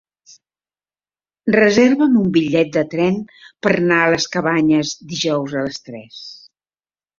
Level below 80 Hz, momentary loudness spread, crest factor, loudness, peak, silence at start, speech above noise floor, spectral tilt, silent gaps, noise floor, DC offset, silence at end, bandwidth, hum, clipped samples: -56 dBFS; 20 LU; 16 dB; -16 LUFS; -2 dBFS; 1.45 s; over 74 dB; -5 dB/octave; none; under -90 dBFS; under 0.1%; 0.85 s; 7.6 kHz; none; under 0.1%